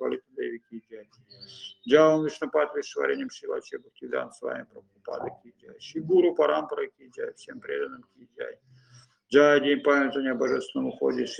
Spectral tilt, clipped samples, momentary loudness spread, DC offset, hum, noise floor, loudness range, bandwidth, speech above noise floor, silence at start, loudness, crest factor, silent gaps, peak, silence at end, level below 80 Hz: -5 dB/octave; under 0.1%; 21 LU; under 0.1%; none; -57 dBFS; 6 LU; 9.4 kHz; 32 dB; 0 s; -26 LUFS; 22 dB; none; -6 dBFS; 0 s; -74 dBFS